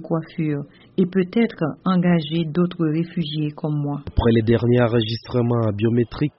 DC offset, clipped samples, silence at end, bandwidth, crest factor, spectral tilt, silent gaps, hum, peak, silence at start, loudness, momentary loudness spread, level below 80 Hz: under 0.1%; under 0.1%; 0.1 s; 5.8 kHz; 16 dB; -7 dB/octave; none; none; -6 dBFS; 0 s; -21 LUFS; 7 LU; -38 dBFS